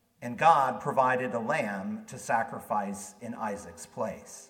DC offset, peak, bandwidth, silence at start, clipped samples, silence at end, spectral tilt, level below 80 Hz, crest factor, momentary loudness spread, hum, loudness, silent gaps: under 0.1%; -8 dBFS; 17 kHz; 0.2 s; under 0.1%; 0.05 s; -5 dB/octave; -70 dBFS; 22 dB; 17 LU; none; -29 LUFS; none